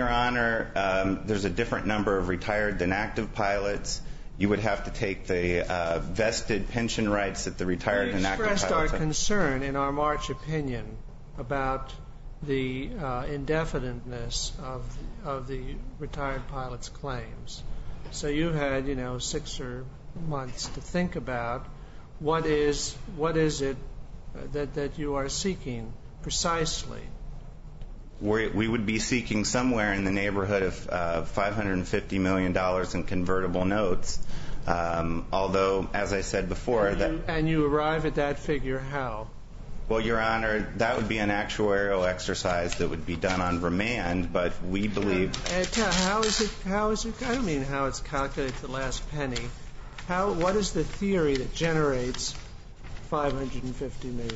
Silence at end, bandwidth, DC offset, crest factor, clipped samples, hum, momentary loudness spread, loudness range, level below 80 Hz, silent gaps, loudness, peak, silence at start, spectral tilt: 0 s; 8 kHz; under 0.1%; 22 dB; under 0.1%; none; 14 LU; 5 LU; -38 dBFS; none; -28 LUFS; -6 dBFS; 0 s; -4.5 dB/octave